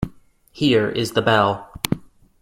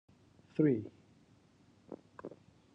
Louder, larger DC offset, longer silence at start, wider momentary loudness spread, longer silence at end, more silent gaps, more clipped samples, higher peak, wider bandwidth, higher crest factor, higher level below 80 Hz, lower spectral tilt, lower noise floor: first, -20 LUFS vs -34 LUFS; neither; second, 0 s vs 0.6 s; second, 10 LU vs 22 LU; about the same, 0.45 s vs 0.45 s; neither; neither; first, 0 dBFS vs -18 dBFS; first, 16.5 kHz vs 5.8 kHz; about the same, 22 dB vs 22 dB; first, -46 dBFS vs -80 dBFS; second, -5 dB/octave vs -10 dB/octave; second, -49 dBFS vs -66 dBFS